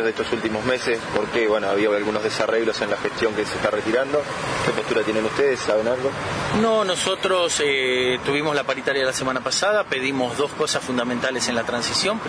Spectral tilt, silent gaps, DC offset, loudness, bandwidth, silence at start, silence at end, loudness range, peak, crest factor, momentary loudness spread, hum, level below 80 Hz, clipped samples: -3.5 dB/octave; none; under 0.1%; -22 LUFS; 11 kHz; 0 s; 0 s; 2 LU; 0 dBFS; 20 dB; 4 LU; none; -52 dBFS; under 0.1%